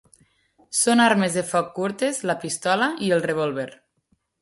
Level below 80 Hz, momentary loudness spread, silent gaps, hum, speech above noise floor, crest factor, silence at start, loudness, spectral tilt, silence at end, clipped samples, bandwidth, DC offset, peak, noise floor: -66 dBFS; 10 LU; none; none; 47 dB; 18 dB; 0.7 s; -22 LUFS; -3.5 dB/octave; 0.7 s; under 0.1%; 12 kHz; under 0.1%; -4 dBFS; -69 dBFS